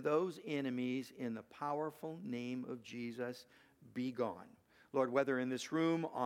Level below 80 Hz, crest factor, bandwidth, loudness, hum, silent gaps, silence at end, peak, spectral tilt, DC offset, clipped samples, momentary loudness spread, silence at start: -86 dBFS; 20 dB; 16 kHz; -40 LUFS; none; none; 0 s; -20 dBFS; -6 dB/octave; under 0.1%; under 0.1%; 10 LU; 0 s